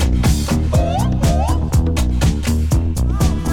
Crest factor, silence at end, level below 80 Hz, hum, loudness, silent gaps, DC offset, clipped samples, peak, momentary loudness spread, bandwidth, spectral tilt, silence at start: 10 dB; 0 s; -18 dBFS; none; -17 LUFS; none; under 0.1%; under 0.1%; -6 dBFS; 2 LU; 17 kHz; -6 dB/octave; 0 s